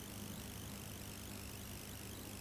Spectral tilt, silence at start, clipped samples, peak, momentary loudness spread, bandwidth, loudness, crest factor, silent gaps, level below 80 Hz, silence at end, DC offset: -3.5 dB/octave; 0 s; under 0.1%; -34 dBFS; 1 LU; 16 kHz; -48 LUFS; 16 dB; none; -58 dBFS; 0 s; under 0.1%